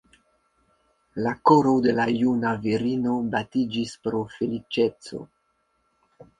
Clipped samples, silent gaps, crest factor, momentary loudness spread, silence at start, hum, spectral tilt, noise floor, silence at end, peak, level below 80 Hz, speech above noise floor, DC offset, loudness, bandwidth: under 0.1%; none; 22 dB; 11 LU; 1.15 s; none; -6.5 dB/octave; -70 dBFS; 0.15 s; -4 dBFS; -60 dBFS; 47 dB; under 0.1%; -24 LUFS; 10.5 kHz